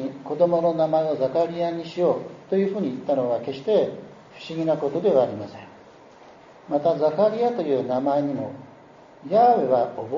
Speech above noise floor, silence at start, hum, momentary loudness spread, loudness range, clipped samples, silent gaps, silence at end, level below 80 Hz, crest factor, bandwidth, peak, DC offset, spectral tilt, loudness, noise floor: 26 dB; 0 s; none; 13 LU; 3 LU; under 0.1%; none; 0 s; -68 dBFS; 16 dB; 7.2 kHz; -6 dBFS; under 0.1%; -6 dB/octave; -23 LUFS; -48 dBFS